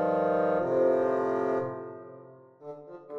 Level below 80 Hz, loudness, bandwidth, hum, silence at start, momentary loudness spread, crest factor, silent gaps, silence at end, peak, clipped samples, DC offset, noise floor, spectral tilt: -72 dBFS; -27 LUFS; 6.6 kHz; none; 0 s; 20 LU; 14 dB; none; 0 s; -14 dBFS; under 0.1%; under 0.1%; -51 dBFS; -8.5 dB/octave